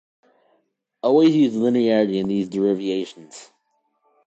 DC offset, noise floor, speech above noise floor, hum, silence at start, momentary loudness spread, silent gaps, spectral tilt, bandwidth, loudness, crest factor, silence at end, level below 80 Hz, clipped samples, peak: under 0.1%; -70 dBFS; 50 dB; none; 1.05 s; 15 LU; none; -7 dB/octave; 8.2 kHz; -20 LUFS; 16 dB; 0.85 s; -66 dBFS; under 0.1%; -6 dBFS